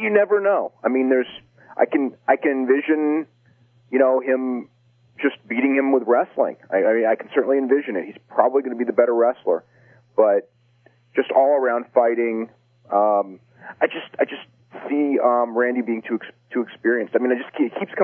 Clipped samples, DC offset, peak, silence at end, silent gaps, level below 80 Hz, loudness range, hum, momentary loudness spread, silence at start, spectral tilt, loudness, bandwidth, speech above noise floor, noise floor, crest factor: under 0.1%; under 0.1%; -2 dBFS; 0 s; none; -78 dBFS; 3 LU; none; 9 LU; 0 s; -9 dB/octave; -21 LUFS; 3.5 kHz; 37 dB; -57 dBFS; 18 dB